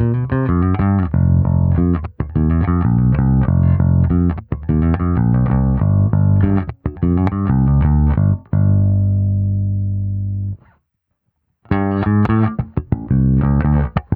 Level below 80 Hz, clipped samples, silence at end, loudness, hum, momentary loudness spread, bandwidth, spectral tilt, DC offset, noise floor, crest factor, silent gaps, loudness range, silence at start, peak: -26 dBFS; under 0.1%; 0 s; -16 LUFS; 50 Hz at -40 dBFS; 7 LU; 3.5 kHz; -12.5 dB/octave; under 0.1%; -71 dBFS; 14 dB; none; 5 LU; 0 s; 0 dBFS